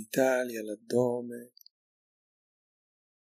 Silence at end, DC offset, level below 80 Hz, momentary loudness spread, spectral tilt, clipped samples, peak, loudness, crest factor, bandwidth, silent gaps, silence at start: 1.9 s; under 0.1%; -90 dBFS; 14 LU; -5 dB/octave; under 0.1%; -12 dBFS; -30 LUFS; 20 dB; 15.5 kHz; none; 0 s